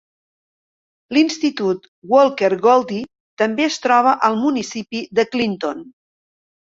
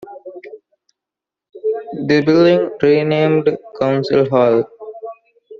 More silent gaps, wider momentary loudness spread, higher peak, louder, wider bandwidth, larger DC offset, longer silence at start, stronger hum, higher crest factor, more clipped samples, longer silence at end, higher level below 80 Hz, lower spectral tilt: first, 1.88-2.02 s, 3.20-3.37 s vs none; second, 12 LU vs 22 LU; about the same, -2 dBFS vs 0 dBFS; second, -18 LUFS vs -15 LUFS; first, 7.8 kHz vs 7 kHz; neither; first, 1.1 s vs 0 s; neither; about the same, 18 dB vs 16 dB; neither; first, 0.75 s vs 0.05 s; second, -64 dBFS vs -58 dBFS; about the same, -4.5 dB/octave vs -5.5 dB/octave